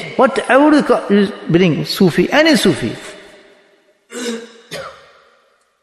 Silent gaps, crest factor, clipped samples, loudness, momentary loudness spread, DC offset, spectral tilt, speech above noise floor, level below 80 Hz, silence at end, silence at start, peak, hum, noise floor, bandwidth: none; 14 dB; under 0.1%; -13 LUFS; 20 LU; under 0.1%; -5.5 dB/octave; 44 dB; -50 dBFS; 0.9 s; 0 s; 0 dBFS; none; -56 dBFS; 12.5 kHz